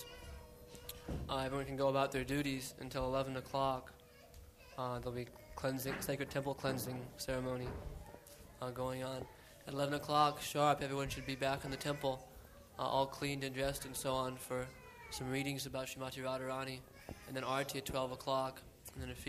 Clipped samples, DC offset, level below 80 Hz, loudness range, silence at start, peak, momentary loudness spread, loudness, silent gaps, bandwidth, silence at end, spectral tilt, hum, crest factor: under 0.1%; under 0.1%; -58 dBFS; 5 LU; 0 s; -18 dBFS; 18 LU; -40 LUFS; none; 15 kHz; 0 s; -4.5 dB/octave; none; 22 dB